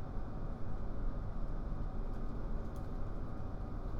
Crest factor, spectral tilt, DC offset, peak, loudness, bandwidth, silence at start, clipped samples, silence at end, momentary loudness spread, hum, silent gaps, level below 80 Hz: 12 dB; -9 dB/octave; under 0.1%; -26 dBFS; -45 LUFS; 5.4 kHz; 0 s; under 0.1%; 0 s; 1 LU; none; none; -40 dBFS